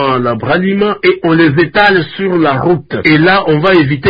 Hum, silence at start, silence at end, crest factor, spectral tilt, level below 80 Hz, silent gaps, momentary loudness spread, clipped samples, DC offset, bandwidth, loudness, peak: none; 0 s; 0 s; 10 dB; -8.5 dB/octave; -42 dBFS; none; 5 LU; under 0.1%; under 0.1%; 5.2 kHz; -10 LUFS; 0 dBFS